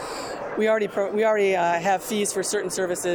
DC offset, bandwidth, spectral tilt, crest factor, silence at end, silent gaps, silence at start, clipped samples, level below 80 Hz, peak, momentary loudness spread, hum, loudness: under 0.1%; over 20 kHz; -3.5 dB/octave; 12 dB; 0 s; none; 0 s; under 0.1%; -62 dBFS; -10 dBFS; 7 LU; none; -23 LUFS